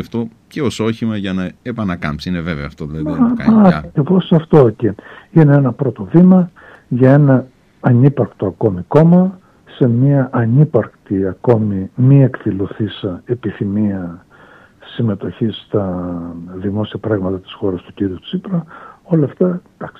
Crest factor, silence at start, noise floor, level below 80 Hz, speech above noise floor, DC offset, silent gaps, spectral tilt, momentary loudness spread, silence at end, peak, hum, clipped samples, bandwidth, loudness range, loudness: 14 dB; 0 s; -44 dBFS; -44 dBFS; 30 dB; under 0.1%; none; -9 dB/octave; 13 LU; 0.1 s; 0 dBFS; none; under 0.1%; 8.6 kHz; 9 LU; -15 LUFS